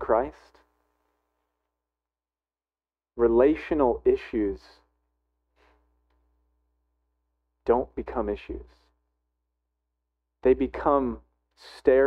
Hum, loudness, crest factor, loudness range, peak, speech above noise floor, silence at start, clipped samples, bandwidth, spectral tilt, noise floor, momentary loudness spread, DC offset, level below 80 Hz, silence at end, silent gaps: none; -25 LUFS; 22 dB; 8 LU; -6 dBFS; over 66 dB; 0 s; under 0.1%; 6 kHz; -8 dB/octave; under -90 dBFS; 16 LU; under 0.1%; -48 dBFS; 0 s; none